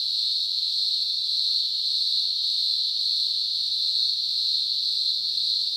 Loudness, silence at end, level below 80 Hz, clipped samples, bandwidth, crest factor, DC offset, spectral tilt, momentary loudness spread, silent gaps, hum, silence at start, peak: -22 LUFS; 0 s; -76 dBFS; under 0.1%; 18 kHz; 14 dB; under 0.1%; 2.5 dB/octave; 1 LU; none; none; 0 s; -10 dBFS